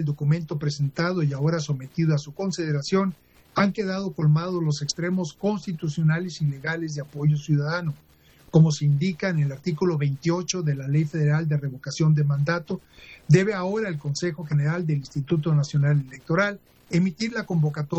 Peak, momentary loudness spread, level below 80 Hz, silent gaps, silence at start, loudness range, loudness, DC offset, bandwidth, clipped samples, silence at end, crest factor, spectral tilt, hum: -6 dBFS; 8 LU; -62 dBFS; none; 0 s; 2 LU; -25 LUFS; under 0.1%; 8.2 kHz; under 0.1%; 0 s; 18 dB; -6.5 dB/octave; none